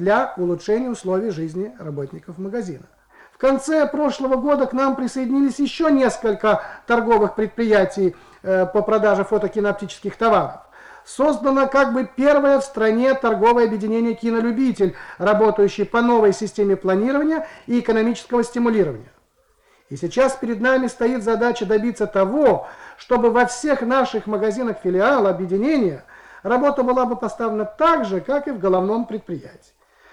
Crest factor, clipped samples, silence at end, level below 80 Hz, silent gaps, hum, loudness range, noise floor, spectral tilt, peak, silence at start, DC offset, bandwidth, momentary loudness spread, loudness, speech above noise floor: 14 dB; under 0.1%; 0.6 s; -52 dBFS; none; none; 4 LU; -60 dBFS; -6 dB/octave; -6 dBFS; 0 s; under 0.1%; 11.5 kHz; 11 LU; -19 LUFS; 42 dB